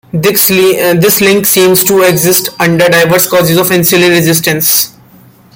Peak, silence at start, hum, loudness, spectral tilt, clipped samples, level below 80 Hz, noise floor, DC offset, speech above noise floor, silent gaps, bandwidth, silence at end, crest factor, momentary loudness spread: 0 dBFS; 0.15 s; none; -7 LUFS; -3.5 dB/octave; 0.2%; -46 dBFS; -39 dBFS; under 0.1%; 32 dB; none; over 20 kHz; 0.65 s; 8 dB; 3 LU